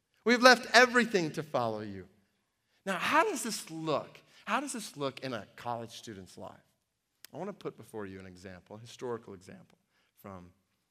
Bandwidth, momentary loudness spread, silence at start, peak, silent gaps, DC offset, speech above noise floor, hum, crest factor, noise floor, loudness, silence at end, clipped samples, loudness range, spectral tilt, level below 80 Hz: 15.5 kHz; 27 LU; 0.25 s; -4 dBFS; none; under 0.1%; 49 dB; none; 30 dB; -80 dBFS; -29 LUFS; 0.45 s; under 0.1%; 18 LU; -3 dB/octave; -80 dBFS